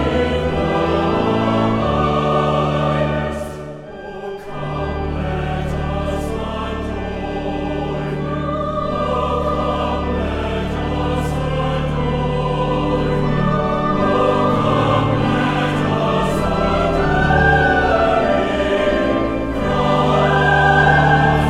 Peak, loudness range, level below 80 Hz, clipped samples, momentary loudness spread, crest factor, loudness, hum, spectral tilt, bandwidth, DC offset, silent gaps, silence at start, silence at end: -2 dBFS; 7 LU; -30 dBFS; under 0.1%; 10 LU; 16 dB; -18 LUFS; none; -7 dB/octave; 11.5 kHz; under 0.1%; none; 0 s; 0 s